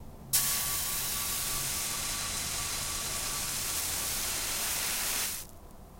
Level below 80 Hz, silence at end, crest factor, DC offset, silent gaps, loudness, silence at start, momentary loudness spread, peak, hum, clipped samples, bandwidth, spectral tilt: -48 dBFS; 0 s; 24 dB; under 0.1%; none; -30 LUFS; 0 s; 4 LU; -10 dBFS; none; under 0.1%; 16.5 kHz; -0.5 dB/octave